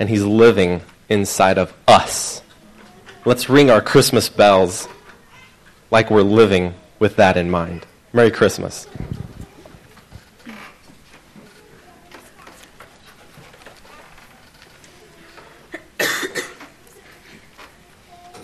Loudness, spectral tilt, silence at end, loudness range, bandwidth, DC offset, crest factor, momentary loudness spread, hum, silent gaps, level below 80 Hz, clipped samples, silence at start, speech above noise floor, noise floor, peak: -15 LUFS; -4.5 dB/octave; 0.05 s; 13 LU; 13.5 kHz; under 0.1%; 18 dB; 22 LU; none; none; -48 dBFS; under 0.1%; 0 s; 33 dB; -48 dBFS; 0 dBFS